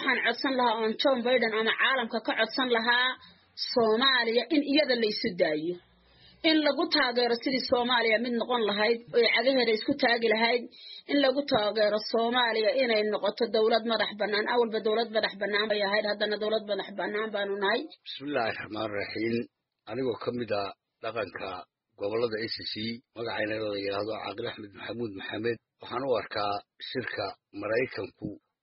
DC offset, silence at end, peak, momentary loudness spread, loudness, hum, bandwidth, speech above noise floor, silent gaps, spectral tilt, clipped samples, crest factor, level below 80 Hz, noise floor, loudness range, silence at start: under 0.1%; 0.25 s; -10 dBFS; 12 LU; -28 LUFS; none; 5.8 kHz; 31 dB; none; -1 dB/octave; under 0.1%; 18 dB; -70 dBFS; -59 dBFS; 8 LU; 0 s